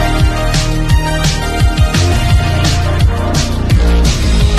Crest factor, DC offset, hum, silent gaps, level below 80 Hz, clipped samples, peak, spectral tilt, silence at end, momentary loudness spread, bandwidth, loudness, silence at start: 10 dB; under 0.1%; none; none; -14 dBFS; under 0.1%; 0 dBFS; -5 dB/octave; 0 s; 3 LU; 13.5 kHz; -13 LUFS; 0 s